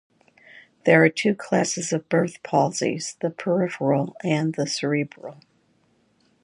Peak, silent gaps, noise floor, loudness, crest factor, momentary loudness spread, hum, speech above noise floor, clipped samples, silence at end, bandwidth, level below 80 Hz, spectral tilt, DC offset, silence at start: -2 dBFS; none; -64 dBFS; -23 LUFS; 22 dB; 10 LU; none; 42 dB; under 0.1%; 1.1 s; 11.5 kHz; -72 dBFS; -5 dB/octave; under 0.1%; 0.85 s